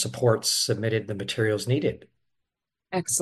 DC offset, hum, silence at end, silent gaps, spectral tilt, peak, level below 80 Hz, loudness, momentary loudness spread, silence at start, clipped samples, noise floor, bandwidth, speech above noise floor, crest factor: under 0.1%; none; 0 s; none; -4 dB/octave; -8 dBFS; -58 dBFS; -25 LUFS; 8 LU; 0 s; under 0.1%; -86 dBFS; 13 kHz; 60 dB; 18 dB